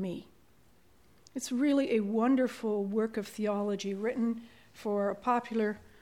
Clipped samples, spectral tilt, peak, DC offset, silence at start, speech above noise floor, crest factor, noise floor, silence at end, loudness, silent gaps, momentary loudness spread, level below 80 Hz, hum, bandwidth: under 0.1%; -5.5 dB/octave; -16 dBFS; under 0.1%; 0 s; 34 dB; 16 dB; -65 dBFS; 0.25 s; -32 LUFS; none; 11 LU; -70 dBFS; none; 16.5 kHz